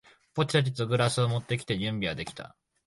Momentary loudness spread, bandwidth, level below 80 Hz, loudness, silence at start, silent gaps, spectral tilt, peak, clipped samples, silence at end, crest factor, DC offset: 13 LU; 11.5 kHz; -58 dBFS; -29 LUFS; 0.35 s; none; -5.5 dB/octave; -12 dBFS; under 0.1%; 0.4 s; 18 dB; under 0.1%